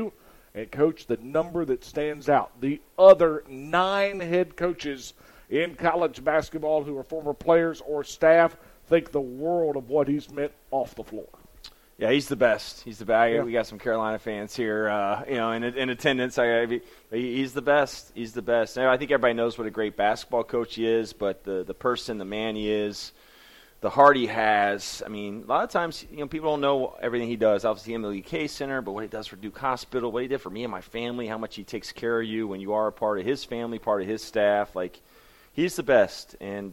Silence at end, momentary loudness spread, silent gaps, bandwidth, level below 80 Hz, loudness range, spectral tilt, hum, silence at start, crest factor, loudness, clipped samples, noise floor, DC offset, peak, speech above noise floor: 0 s; 12 LU; none; 16.5 kHz; -56 dBFS; 7 LU; -5 dB/octave; none; 0 s; 22 dB; -26 LUFS; under 0.1%; -53 dBFS; under 0.1%; -4 dBFS; 28 dB